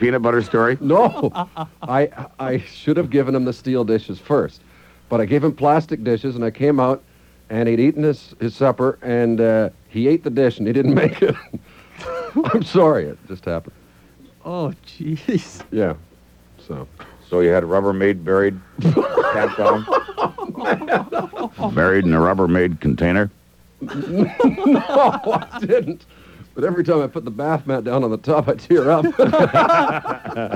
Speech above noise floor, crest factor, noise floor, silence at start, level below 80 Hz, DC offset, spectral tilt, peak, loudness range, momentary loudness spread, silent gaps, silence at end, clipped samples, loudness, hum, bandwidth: 31 dB; 16 dB; -49 dBFS; 0 s; -48 dBFS; under 0.1%; -8 dB/octave; -2 dBFS; 4 LU; 13 LU; none; 0 s; under 0.1%; -18 LUFS; none; 14 kHz